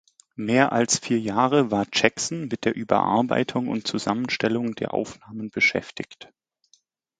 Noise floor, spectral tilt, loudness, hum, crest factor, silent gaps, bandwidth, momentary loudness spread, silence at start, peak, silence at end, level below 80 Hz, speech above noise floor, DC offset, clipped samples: -64 dBFS; -4 dB/octave; -23 LUFS; none; 24 dB; none; 9.6 kHz; 13 LU; 0.4 s; 0 dBFS; 0.95 s; -62 dBFS; 40 dB; under 0.1%; under 0.1%